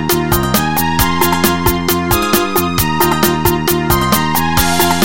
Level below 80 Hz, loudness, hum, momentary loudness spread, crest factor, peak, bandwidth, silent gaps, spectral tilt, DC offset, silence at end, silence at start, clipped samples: -28 dBFS; -13 LUFS; none; 2 LU; 14 dB; 0 dBFS; 17.5 kHz; none; -4 dB/octave; 3%; 0 s; 0 s; under 0.1%